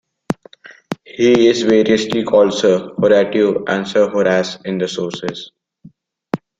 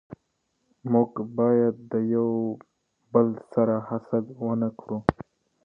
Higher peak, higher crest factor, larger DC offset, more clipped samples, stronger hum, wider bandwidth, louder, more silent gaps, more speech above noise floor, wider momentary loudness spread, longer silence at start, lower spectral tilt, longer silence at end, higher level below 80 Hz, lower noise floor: about the same, -2 dBFS vs 0 dBFS; second, 14 dB vs 26 dB; neither; neither; neither; first, 9 kHz vs 5.4 kHz; first, -15 LUFS vs -26 LUFS; neither; second, 32 dB vs 50 dB; first, 14 LU vs 7 LU; first, 0.3 s vs 0.1 s; second, -5 dB/octave vs -11 dB/octave; second, 0.25 s vs 0.4 s; about the same, -56 dBFS vs -56 dBFS; second, -46 dBFS vs -74 dBFS